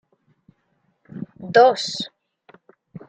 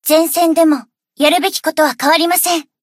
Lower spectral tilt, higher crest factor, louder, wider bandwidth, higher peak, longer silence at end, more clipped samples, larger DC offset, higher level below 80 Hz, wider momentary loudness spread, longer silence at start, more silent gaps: first, -3.5 dB/octave vs -0.5 dB/octave; first, 20 dB vs 14 dB; second, -18 LUFS vs -13 LUFS; second, 9.2 kHz vs 16.5 kHz; about the same, -2 dBFS vs 0 dBFS; about the same, 0.1 s vs 0.2 s; neither; neither; second, -72 dBFS vs -66 dBFS; first, 22 LU vs 4 LU; first, 1.15 s vs 0.05 s; neither